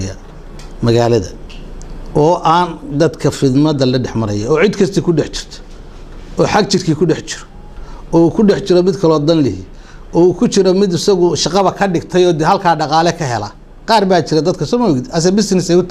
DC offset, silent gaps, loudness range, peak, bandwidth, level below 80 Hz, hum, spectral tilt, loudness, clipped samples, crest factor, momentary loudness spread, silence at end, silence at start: under 0.1%; none; 3 LU; 0 dBFS; 12.5 kHz; -34 dBFS; none; -5.5 dB/octave; -13 LUFS; under 0.1%; 14 dB; 15 LU; 0 s; 0 s